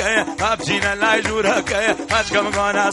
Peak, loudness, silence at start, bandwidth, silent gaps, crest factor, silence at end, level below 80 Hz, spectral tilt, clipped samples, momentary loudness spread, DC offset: -2 dBFS; -18 LUFS; 0 s; 11.5 kHz; none; 18 dB; 0 s; -42 dBFS; -3 dB/octave; under 0.1%; 2 LU; under 0.1%